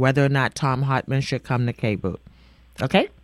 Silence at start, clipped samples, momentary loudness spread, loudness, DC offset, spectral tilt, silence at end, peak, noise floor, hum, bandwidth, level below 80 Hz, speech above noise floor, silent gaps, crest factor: 0 s; under 0.1%; 9 LU; -23 LUFS; under 0.1%; -6.5 dB/octave; 0.15 s; -2 dBFS; -51 dBFS; none; 12 kHz; -50 dBFS; 29 dB; none; 20 dB